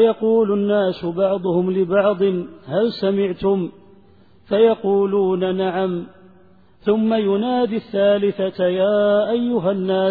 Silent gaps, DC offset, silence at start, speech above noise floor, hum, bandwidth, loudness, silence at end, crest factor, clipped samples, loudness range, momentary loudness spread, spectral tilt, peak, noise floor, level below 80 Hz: none; 0.2%; 0 s; 34 dB; none; 4.9 kHz; -19 LUFS; 0 s; 14 dB; under 0.1%; 2 LU; 6 LU; -10 dB/octave; -4 dBFS; -52 dBFS; -56 dBFS